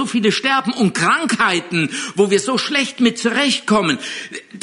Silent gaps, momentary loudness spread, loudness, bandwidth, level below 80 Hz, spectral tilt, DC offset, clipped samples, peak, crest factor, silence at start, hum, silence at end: none; 6 LU; -17 LUFS; 11 kHz; -60 dBFS; -3.5 dB/octave; under 0.1%; under 0.1%; -2 dBFS; 14 dB; 0 s; none; 0 s